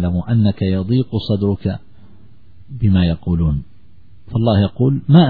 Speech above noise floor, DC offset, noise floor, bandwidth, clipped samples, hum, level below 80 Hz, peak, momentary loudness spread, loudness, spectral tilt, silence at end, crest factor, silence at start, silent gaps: 33 dB; 1%; -48 dBFS; 4.9 kHz; under 0.1%; none; -34 dBFS; 0 dBFS; 9 LU; -17 LUFS; -11 dB/octave; 0 s; 16 dB; 0 s; none